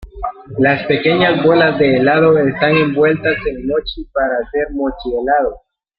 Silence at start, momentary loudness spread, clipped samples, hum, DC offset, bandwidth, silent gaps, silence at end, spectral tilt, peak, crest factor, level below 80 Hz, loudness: 0 s; 9 LU; under 0.1%; none; under 0.1%; 5.2 kHz; none; 0.4 s; -10 dB/octave; 0 dBFS; 14 dB; -38 dBFS; -14 LUFS